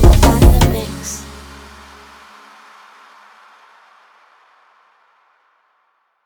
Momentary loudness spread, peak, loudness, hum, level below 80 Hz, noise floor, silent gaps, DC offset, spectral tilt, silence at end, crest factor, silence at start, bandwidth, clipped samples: 29 LU; 0 dBFS; -14 LUFS; none; -20 dBFS; -63 dBFS; none; under 0.1%; -5.5 dB/octave; 5 s; 18 dB; 0 s; over 20 kHz; under 0.1%